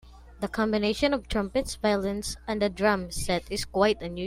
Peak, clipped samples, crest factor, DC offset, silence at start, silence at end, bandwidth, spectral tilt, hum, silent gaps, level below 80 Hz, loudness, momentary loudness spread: -8 dBFS; under 0.1%; 18 dB; under 0.1%; 0.05 s; 0 s; 16 kHz; -4.5 dB/octave; none; none; -44 dBFS; -27 LUFS; 7 LU